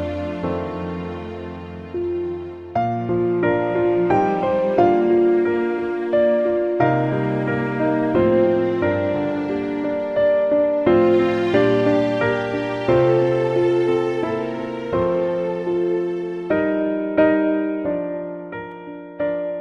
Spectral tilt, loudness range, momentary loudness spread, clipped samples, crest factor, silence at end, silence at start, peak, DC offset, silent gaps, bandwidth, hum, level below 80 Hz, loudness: -8.5 dB/octave; 4 LU; 11 LU; under 0.1%; 16 dB; 0 s; 0 s; -4 dBFS; under 0.1%; none; 6.6 kHz; none; -50 dBFS; -20 LUFS